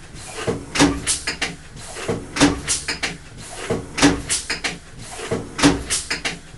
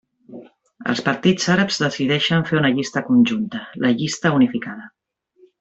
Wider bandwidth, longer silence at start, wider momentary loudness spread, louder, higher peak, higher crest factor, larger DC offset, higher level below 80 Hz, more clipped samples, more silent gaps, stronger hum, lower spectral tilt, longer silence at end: first, 12.5 kHz vs 8 kHz; second, 0 s vs 0.3 s; first, 16 LU vs 11 LU; about the same, -21 LUFS vs -19 LUFS; first, 0 dBFS vs -4 dBFS; first, 22 dB vs 16 dB; neither; first, -38 dBFS vs -58 dBFS; neither; neither; neither; second, -3 dB/octave vs -5 dB/octave; second, 0 s vs 0.7 s